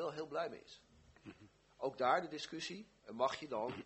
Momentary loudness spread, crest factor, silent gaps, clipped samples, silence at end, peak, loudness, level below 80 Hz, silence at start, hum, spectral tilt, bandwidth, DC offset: 23 LU; 22 dB; none; under 0.1%; 0 s; -20 dBFS; -40 LUFS; -76 dBFS; 0 s; none; -4 dB/octave; 8.2 kHz; under 0.1%